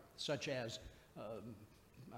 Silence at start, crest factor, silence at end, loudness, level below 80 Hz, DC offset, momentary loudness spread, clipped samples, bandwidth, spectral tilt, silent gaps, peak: 0 s; 20 dB; 0 s; -46 LUFS; -70 dBFS; under 0.1%; 19 LU; under 0.1%; 16 kHz; -4 dB/octave; none; -28 dBFS